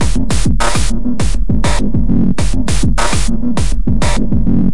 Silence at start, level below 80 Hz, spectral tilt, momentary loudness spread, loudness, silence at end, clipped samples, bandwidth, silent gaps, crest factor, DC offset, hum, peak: 0 s; -16 dBFS; -5 dB/octave; 3 LU; -16 LUFS; 0 s; under 0.1%; 11.5 kHz; none; 10 dB; 30%; none; 0 dBFS